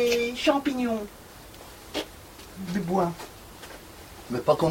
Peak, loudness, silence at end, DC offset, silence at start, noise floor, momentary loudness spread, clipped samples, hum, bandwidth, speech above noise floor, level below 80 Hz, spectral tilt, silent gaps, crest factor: -8 dBFS; -27 LUFS; 0 s; under 0.1%; 0 s; -46 dBFS; 20 LU; under 0.1%; none; 16.5 kHz; 20 dB; -54 dBFS; -5 dB/octave; none; 20 dB